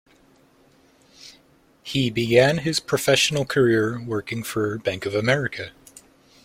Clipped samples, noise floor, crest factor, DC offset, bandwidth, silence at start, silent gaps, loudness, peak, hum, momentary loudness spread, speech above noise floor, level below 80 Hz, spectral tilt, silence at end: under 0.1%; -57 dBFS; 22 dB; under 0.1%; 16.5 kHz; 1.2 s; none; -22 LUFS; -2 dBFS; none; 11 LU; 36 dB; -56 dBFS; -4.5 dB/octave; 0.75 s